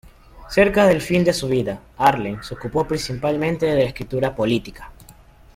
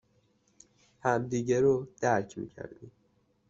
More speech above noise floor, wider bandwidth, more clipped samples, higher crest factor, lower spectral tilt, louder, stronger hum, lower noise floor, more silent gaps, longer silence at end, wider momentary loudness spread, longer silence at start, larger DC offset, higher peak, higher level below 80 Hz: second, 27 dB vs 41 dB; first, 16.5 kHz vs 7.8 kHz; neither; about the same, 18 dB vs 20 dB; about the same, -6 dB/octave vs -6.5 dB/octave; first, -20 LUFS vs -29 LUFS; neither; second, -47 dBFS vs -70 dBFS; neither; second, 0.45 s vs 0.6 s; second, 10 LU vs 17 LU; second, 0.35 s vs 1.05 s; neither; first, -2 dBFS vs -12 dBFS; first, -42 dBFS vs -64 dBFS